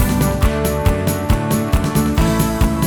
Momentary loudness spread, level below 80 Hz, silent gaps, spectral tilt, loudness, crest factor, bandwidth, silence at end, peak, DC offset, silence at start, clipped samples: 2 LU; -22 dBFS; none; -6 dB/octave; -17 LUFS; 14 dB; over 20 kHz; 0 s; -2 dBFS; under 0.1%; 0 s; under 0.1%